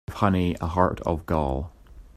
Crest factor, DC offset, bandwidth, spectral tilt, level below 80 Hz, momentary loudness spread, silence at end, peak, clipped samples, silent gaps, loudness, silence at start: 22 dB; under 0.1%; 14.5 kHz; -8 dB/octave; -40 dBFS; 8 LU; 0.1 s; -4 dBFS; under 0.1%; none; -25 LUFS; 0.1 s